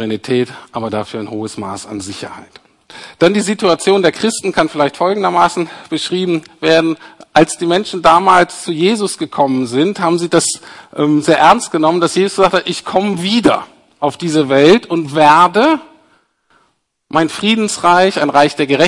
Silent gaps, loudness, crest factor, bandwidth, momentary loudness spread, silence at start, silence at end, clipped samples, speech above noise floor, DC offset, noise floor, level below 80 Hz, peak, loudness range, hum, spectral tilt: none; -13 LUFS; 14 dB; 11.5 kHz; 14 LU; 0 s; 0 s; 0.2%; 48 dB; under 0.1%; -61 dBFS; -52 dBFS; 0 dBFS; 4 LU; none; -4.5 dB/octave